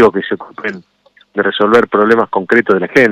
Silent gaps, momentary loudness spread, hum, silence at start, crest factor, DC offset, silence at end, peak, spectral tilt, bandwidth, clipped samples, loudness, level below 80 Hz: none; 13 LU; none; 0 s; 12 dB; under 0.1%; 0 s; 0 dBFS; -6 dB/octave; 10.5 kHz; 0.2%; -13 LUFS; -52 dBFS